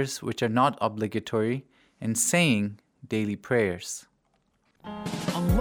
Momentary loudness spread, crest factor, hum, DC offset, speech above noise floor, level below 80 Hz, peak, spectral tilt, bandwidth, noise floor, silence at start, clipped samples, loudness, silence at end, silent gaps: 14 LU; 18 dB; none; under 0.1%; 43 dB; -44 dBFS; -10 dBFS; -4.5 dB/octave; over 20 kHz; -70 dBFS; 0 s; under 0.1%; -27 LUFS; 0 s; none